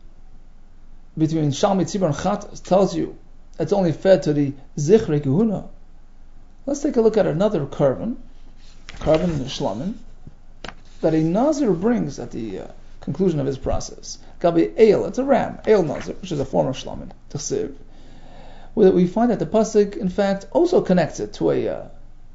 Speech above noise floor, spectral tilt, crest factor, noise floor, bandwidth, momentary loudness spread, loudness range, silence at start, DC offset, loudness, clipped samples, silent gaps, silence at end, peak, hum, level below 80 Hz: 21 dB; -6.5 dB/octave; 20 dB; -40 dBFS; 8 kHz; 15 LU; 4 LU; 0 s; under 0.1%; -20 LUFS; under 0.1%; none; 0 s; -2 dBFS; none; -38 dBFS